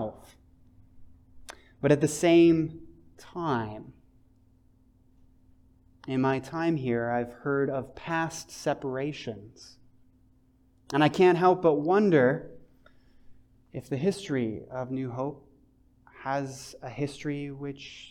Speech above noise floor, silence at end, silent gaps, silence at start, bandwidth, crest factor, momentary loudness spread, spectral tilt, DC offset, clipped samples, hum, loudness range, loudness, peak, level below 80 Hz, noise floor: 36 dB; 0 s; none; 0 s; 13.5 kHz; 20 dB; 21 LU; -6 dB/octave; under 0.1%; under 0.1%; none; 10 LU; -27 LUFS; -10 dBFS; -60 dBFS; -63 dBFS